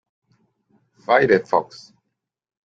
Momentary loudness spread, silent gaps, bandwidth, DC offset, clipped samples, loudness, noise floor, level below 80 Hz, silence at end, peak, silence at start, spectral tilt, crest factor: 22 LU; none; 7.6 kHz; under 0.1%; under 0.1%; -18 LUFS; -79 dBFS; -62 dBFS; 1 s; -2 dBFS; 1.1 s; -6 dB/octave; 22 dB